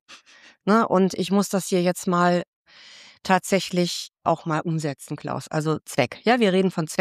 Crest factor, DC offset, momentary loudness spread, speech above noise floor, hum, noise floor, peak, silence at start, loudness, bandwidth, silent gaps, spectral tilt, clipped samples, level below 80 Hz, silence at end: 18 dB; under 0.1%; 11 LU; 30 dB; none; -52 dBFS; -6 dBFS; 0.1 s; -23 LUFS; 15.5 kHz; 2.48-2.65 s; -5.5 dB/octave; under 0.1%; -66 dBFS; 0.05 s